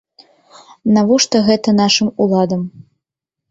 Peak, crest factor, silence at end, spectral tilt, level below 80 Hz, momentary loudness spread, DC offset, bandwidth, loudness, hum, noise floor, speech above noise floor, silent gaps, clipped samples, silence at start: -2 dBFS; 14 dB; 0.7 s; -4.5 dB/octave; -54 dBFS; 10 LU; under 0.1%; 8 kHz; -14 LUFS; none; -82 dBFS; 68 dB; none; under 0.1%; 0.85 s